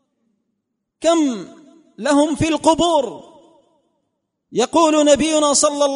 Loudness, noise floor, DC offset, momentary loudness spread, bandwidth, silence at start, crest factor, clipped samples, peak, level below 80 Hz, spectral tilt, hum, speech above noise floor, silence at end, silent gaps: -16 LUFS; -75 dBFS; under 0.1%; 10 LU; 11 kHz; 1 s; 18 dB; under 0.1%; -2 dBFS; -48 dBFS; -3.5 dB/octave; none; 59 dB; 0 s; none